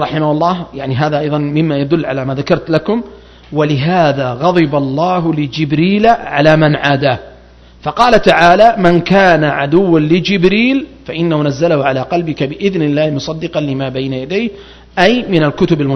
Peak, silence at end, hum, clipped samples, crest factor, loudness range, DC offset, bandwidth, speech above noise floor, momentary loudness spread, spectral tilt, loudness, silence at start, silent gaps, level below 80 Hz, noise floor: 0 dBFS; 0 s; none; 0.4%; 12 dB; 5 LU; under 0.1%; 8.6 kHz; 28 dB; 10 LU; -7 dB/octave; -12 LUFS; 0 s; none; -40 dBFS; -40 dBFS